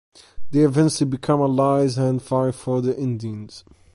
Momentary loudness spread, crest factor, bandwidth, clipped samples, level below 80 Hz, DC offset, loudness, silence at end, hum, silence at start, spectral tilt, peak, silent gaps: 11 LU; 16 dB; 11.5 kHz; under 0.1%; -52 dBFS; under 0.1%; -21 LUFS; 0.35 s; none; 0.35 s; -7 dB/octave; -4 dBFS; none